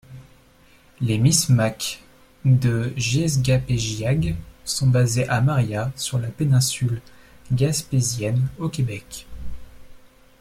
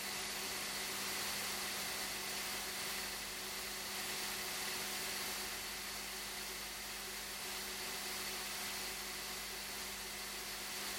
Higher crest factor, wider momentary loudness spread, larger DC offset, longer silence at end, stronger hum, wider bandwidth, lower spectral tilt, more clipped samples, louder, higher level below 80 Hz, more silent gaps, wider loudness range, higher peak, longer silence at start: about the same, 18 dB vs 14 dB; first, 12 LU vs 4 LU; neither; first, 0.45 s vs 0 s; second, none vs 50 Hz at -60 dBFS; about the same, 15.5 kHz vs 17 kHz; first, -5 dB/octave vs -0.5 dB/octave; neither; first, -22 LUFS vs -41 LUFS; first, -44 dBFS vs -64 dBFS; neither; about the same, 4 LU vs 2 LU; first, -4 dBFS vs -28 dBFS; about the same, 0.1 s vs 0 s